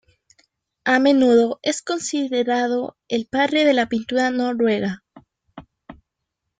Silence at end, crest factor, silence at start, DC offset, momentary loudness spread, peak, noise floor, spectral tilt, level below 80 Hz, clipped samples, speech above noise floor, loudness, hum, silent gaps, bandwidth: 0.65 s; 18 dB; 0.85 s; under 0.1%; 11 LU; -2 dBFS; -80 dBFS; -4 dB/octave; -62 dBFS; under 0.1%; 61 dB; -20 LUFS; none; none; 9.4 kHz